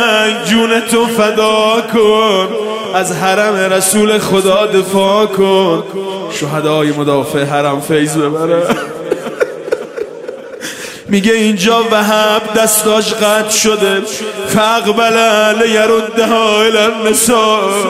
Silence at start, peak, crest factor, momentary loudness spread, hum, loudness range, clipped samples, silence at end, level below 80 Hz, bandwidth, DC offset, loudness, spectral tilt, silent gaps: 0 s; 0 dBFS; 12 dB; 10 LU; none; 5 LU; under 0.1%; 0 s; -50 dBFS; 16 kHz; under 0.1%; -11 LUFS; -3.5 dB/octave; none